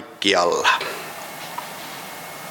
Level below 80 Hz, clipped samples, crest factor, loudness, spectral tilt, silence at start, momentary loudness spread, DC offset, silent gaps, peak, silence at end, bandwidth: -66 dBFS; under 0.1%; 24 dB; -22 LUFS; -2 dB/octave; 0 s; 15 LU; under 0.1%; none; 0 dBFS; 0 s; 17.5 kHz